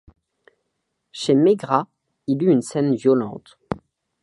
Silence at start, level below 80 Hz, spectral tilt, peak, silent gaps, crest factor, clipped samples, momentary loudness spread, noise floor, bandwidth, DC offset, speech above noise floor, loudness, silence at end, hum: 1.15 s; -60 dBFS; -7 dB/octave; -2 dBFS; none; 20 dB; under 0.1%; 17 LU; -76 dBFS; 11.5 kHz; under 0.1%; 57 dB; -20 LUFS; 0.45 s; none